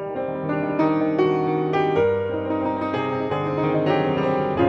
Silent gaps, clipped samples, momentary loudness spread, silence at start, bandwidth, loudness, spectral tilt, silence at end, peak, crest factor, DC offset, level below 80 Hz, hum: none; under 0.1%; 4 LU; 0 s; 6.6 kHz; -22 LUFS; -8.5 dB/octave; 0 s; -6 dBFS; 14 dB; under 0.1%; -54 dBFS; none